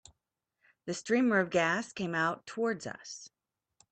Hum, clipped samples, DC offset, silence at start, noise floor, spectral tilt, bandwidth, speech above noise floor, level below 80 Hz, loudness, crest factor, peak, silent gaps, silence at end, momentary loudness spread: none; under 0.1%; under 0.1%; 0.85 s; -86 dBFS; -4.5 dB/octave; 9 kHz; 54 dB; -74 dBFS; -31 LUFS; 20 dB; -14 dBFS; none; 0.65 s; 17 LU